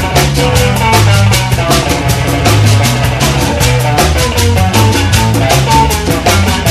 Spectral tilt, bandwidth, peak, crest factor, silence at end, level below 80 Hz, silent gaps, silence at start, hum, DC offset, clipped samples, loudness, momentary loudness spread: -4.5 dB/octave; 14 kHz; 0 dBFS; 8 dB; 0 s; -20 dBFS; none; 0 s; none; under 0.1%; 0.5%; -9 LUFS; 3 LU